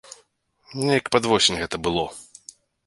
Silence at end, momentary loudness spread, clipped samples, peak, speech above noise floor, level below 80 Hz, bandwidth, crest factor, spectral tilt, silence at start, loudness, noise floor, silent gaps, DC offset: 0.65 s; 20 LU; under 0.1%; -4 dBFS; 40 dB; -50 dBFS; 11.5 kHz; 22 dB; -3.5 dB/octave; 0.1 s; -22 LUFS; -62 dBFS; none; under 0.1%